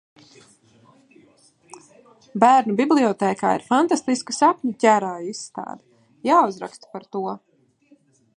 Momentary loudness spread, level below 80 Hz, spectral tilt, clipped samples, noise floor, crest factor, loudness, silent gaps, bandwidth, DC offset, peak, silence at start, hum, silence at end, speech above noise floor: 18 LU; -74 dBFS; -4.5 dB/octave; under 0.1%; -58 dBFS; 22 dB; -20 LUFS; none; 11 kHz; under 0.1%; -2 dBFS; 2.35 s; none; 1 s; 38 dB